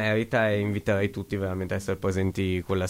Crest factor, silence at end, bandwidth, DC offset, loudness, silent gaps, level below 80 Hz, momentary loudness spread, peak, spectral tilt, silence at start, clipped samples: 14 dB; 0 s; 16 kHz; under 0.1%; -27 LUFS; none; -54 dBFS; 6 LU; -12 dBFS; -6.5 dB/octave; 0 s; under 0.1%